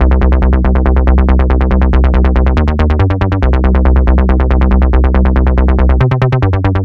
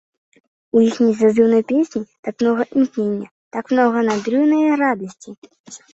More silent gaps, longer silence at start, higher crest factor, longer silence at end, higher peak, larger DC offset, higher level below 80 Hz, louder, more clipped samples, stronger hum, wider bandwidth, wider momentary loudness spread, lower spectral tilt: second, none vs 2.19-2.23 s, 3.31-3.51 s, 5.38-5.42 s, 5.60-5.64 s; second, 0 s vs 0.75 s; second, 8 dB vs 16 dB; second, 0 s vs 0.15 s; about the same, 0 dBFS vs -2 dBFS; neither; first, -10 dBFS vs -64 dBFS; first, -11 LUFS vs -17 LUFS; neither; neither; second, 4.4 kHz vs 8 kHz; second, 2 LU vs 12 LU; first, -10 dB/octave vs -6 dB/octave